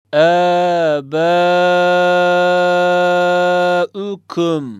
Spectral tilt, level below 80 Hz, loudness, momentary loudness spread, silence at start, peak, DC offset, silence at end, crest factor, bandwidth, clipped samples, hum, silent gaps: -5.5 dB/octave; -70 dBFS; -14 LUFS; 6 LU; 0.1 s; -2 dBFS; under 0.1%; 0 s; 12 dB; 10.5 kHz; under 0.1%; none; none